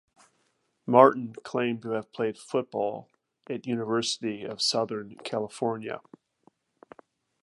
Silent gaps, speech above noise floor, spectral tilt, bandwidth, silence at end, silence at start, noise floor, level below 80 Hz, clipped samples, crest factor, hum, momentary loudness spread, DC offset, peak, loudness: none; 46 dB; -4.5 dB/octave; 11.5 kHz; 1.45 s; 0.85 s; -73 dBFS; -76 dBFS; under 0.1%; 26 dB; none; 16 LU; under 0.1%; -2 dBFS; -28 LUFS